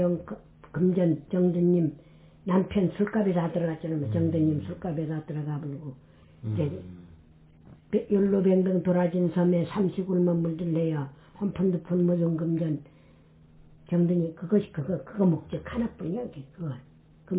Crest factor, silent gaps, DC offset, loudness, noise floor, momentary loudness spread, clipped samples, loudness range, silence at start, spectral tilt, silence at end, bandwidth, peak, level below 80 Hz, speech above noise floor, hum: 16 dB; none; under 0.1%; -27 LUFS; -55 dBFS; 13 LU; under 0.1%; 5 LU; 0 s; -13 dB/octave; 0 s; 4 kHz; -12 dBFS; -56 dBFS; 29 dB; none